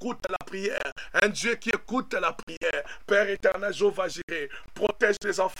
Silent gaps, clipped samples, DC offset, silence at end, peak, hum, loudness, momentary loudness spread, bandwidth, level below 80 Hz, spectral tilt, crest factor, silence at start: 0.92-0.96 s, 2.43-2.47 s, 2.57-2.61 s, 4.23-4.28 s; under 0.1%; 0.7%; 0 s; -6 dBFS; none; -27 LUFS; 8 LU; 16 kHz; -54 dBFS; -3 dB/octave; 22 dB; 0 s